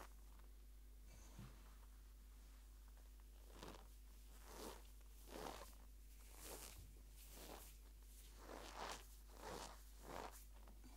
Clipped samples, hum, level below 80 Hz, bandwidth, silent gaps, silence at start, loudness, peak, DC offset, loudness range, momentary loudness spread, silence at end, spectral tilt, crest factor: under 0.1%; none; -62 dBFS; 16 kHz; none; 0 s; -59 LUFS; -34 dBFS; under 0.1%; 6 LU; 10 LU; 0 s; -3.5 dB/octave; 26 dB